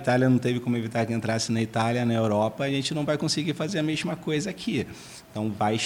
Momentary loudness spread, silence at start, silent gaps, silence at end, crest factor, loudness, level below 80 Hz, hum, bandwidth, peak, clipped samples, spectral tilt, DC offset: 7 LU; 0 s; none; 0 s; 16 dB; -26 LUFS; -60 dBFS; none; 16.5 kHz; -10 dBFS; under 0.1%; -5.5 dB/octave; under 0.1%